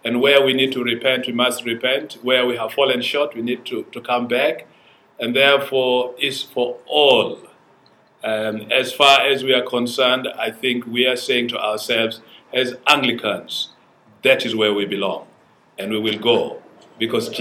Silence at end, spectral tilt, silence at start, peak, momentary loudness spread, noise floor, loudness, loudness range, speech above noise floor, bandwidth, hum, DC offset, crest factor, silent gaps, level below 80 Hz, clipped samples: 0 s; -3.5 dB/octave; 0.05 s; 0 dBFS; 12 LU; -54 dBFS; -18 LUFS; 4 LU; 35 dB; 17.5 kHz; none; under 0.1%; 20 dB; none; -70 dBFS; under 0.1%